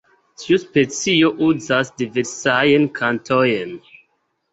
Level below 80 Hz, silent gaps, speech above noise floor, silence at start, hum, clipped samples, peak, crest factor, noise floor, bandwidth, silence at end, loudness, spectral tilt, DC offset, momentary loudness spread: -58 dBFS; none; 50 dB; 0.4 s; none; under 0.1%; -2 dBFS; 16 dB; -67 dBFS; 8.2 kHz; 0.75 s; -18 LUFS; -4.5 dB/octave; under 0.1%; 9 LU